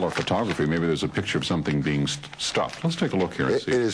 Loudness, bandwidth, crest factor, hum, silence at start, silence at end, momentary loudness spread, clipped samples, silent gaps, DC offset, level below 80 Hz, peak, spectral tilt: -25 LUFS; 11 kHz; 16 dB; none; 0 s; 0 s; 3 LU; under 0.1%; none; under 0.1%; -50 dBFS; -8 dBFS; -5 dB/octave